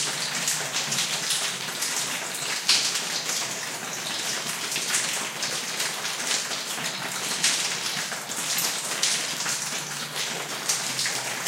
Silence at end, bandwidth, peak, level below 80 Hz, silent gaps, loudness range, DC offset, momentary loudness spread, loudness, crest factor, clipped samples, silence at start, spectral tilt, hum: 0 s; 17 kHz; -6 dBFS; -82 dBFS; none; 2 LU; under 0.1%; 6 LU; -25 LUFS; 22 dB; under 0.1%; 0 s; 0 dB/octave; none